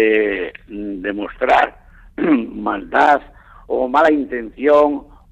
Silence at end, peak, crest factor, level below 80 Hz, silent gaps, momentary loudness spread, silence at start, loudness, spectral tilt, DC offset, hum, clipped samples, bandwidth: 0.25 s; -4 dBFS; 14 dB; -46 dBFS; none; 13 LU; 0 s; -17 LUFS; -6 dB/octave; under 0.1%; none; under 0.1%; 8.2 kHz